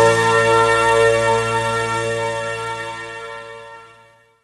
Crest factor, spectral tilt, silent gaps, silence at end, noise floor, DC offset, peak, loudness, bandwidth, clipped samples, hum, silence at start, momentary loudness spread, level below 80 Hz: 16 dB; -3.5 dB/octave; none; 0.6 s; -50 dBFS; under 0.1%; -2 dBFS; -17 LUFS; 12.5 kHz; under 0.1%; none; 0 s; 18 LU; -48 dBFS